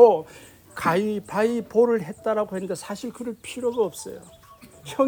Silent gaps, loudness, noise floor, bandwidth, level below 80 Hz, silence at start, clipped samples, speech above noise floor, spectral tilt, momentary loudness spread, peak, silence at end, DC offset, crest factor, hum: none; -25 LUFS; -48 dBFS; 19.5 kHz; -62 dBFS; 0 s; under 0.1%; 25 dB; -5.5 dB/octave; 17 LU; -2 dBFS; 0 s; under 0.1%; 22 dB; none